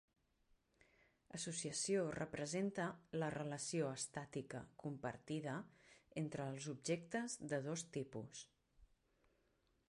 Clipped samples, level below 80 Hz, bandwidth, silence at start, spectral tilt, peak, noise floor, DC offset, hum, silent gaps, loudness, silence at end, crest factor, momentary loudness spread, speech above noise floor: under 0.1%; -78 dBFS; 11 kHz; 1.35 s; -4.5 dB/octave; -30 dBFS; -81 dBFS; under 0.1%; none; none; -45 LUFS; 1.05 s; 18 dB; 10 LU; 36 dB